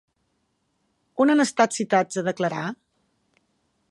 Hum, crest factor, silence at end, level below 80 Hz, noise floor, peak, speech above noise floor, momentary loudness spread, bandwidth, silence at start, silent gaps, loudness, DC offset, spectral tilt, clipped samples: none; 22 dB; 1.15 s; -76 dBFS; -72 dBFS; -4 dBFS; 50 dB; 12 LU; 11.5 kHz; 1.15 s; none; -22 LUFS; under 0.1%; -4.5 dB/octave; under 0.1%